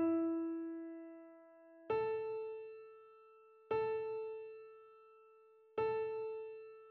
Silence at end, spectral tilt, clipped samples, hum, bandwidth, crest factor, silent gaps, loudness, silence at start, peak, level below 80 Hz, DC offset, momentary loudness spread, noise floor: 0 s; -5.5 dB/octave; under 0.1%; none; 4.3 kHz; 14 dB; none; -41 LUFS; 0 s; -28 dBFS; -80 dBFS; under 0.1%; 23 LU; -65 dBFS